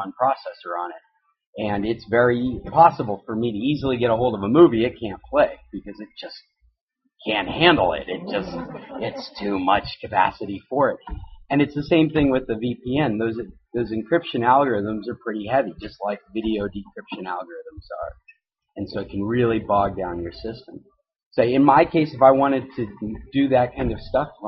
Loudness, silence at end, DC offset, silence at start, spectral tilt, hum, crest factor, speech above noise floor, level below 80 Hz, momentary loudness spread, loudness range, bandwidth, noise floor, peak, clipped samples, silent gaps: -21 LUFS; 0 s; under 0.1%; 0 s; -4.5 dB/octave; none; 22 dB; 51 dB; -46 dBFS; 18 LU; 7 LU; 6 kHz; -72 dBFS; 0 dBFS; under 0.1%; 1.47-1.53 s, 6.81-6.88 s, 21.26-21.31 s